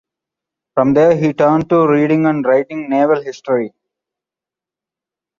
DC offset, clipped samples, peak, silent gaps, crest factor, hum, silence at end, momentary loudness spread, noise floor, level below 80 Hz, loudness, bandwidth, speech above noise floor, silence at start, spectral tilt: under 0.1%; under 0.1%; 0 dBFS; none; 14 dB; none; 1.7 s; 7 LU; -88 dBFS; -56 dBFS; -14 LUFS; 7.2 kHz; 74 dB; 0.75 s; -8 dB/octave